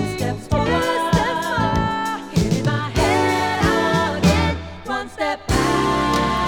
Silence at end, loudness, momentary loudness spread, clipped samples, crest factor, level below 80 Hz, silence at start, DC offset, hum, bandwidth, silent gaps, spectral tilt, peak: 0 s; -20 LUFS; 7 LU; under 0.1%; 16 dB; -32 dBFS; 0 s; under 0.1%; none; 19.5 kHz; none; -5.5 dB/octave; -2 dBFS